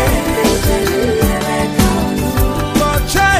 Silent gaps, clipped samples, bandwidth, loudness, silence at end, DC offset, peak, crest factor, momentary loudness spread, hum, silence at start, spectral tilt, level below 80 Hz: none; under 0.1%; 16 kHz; -14 LUFS; 0 s; under 0.1%; 0 dBFS; 14 dB; 3 LU; none; 0 s; -4.5 dB/octave; -22 dBFS